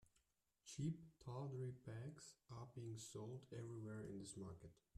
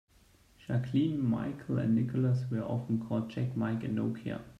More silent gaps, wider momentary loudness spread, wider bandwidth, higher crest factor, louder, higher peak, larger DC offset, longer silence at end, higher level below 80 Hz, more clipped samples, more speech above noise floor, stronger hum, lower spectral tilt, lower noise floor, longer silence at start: neither; first, 9 LU vs 6 LU; first, 13.5 kHz vs 7.6 kHz; about the same, 18 dB vs 14 dB; second, -54 LUFS vs -32 LUFS; second, -36 dBFS vs -18 dBFS; neither; first, 0.25 s vs 0 s; second, -78 dBFS vs -64 dBFS; neither; about the same, 32 dB vs 32 dB; neither; second, -6 dB/octave vs -9 dB/octave; first, -85 dBFS vs -63 dBFS; second, 0 s vs 0.7 s